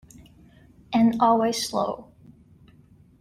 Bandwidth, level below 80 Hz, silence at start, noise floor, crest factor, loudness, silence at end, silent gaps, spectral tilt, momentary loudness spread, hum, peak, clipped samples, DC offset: 15 kHz; -60 dBFS; 0.9 s; -54 dBFS; 20 dB; -23 LUFS; 1.2 s; none; -4.5 dB/octave; 10 LU; none; -6 dBFS; under 0.1%; under 0.1%